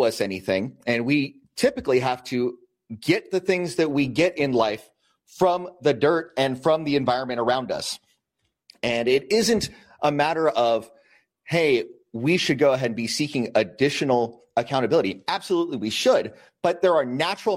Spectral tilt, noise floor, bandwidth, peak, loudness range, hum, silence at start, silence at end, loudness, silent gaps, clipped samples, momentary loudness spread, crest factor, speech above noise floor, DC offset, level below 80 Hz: -5 dB/octave; -76 dBFS; 16 kHz; -6 dBFS; 2 LU; none; 0 s; 0 s; -23 LUFS; none; under 0.1%; 7 LU; 18 dB; 54 dB; under 0.1%; -60 dBFS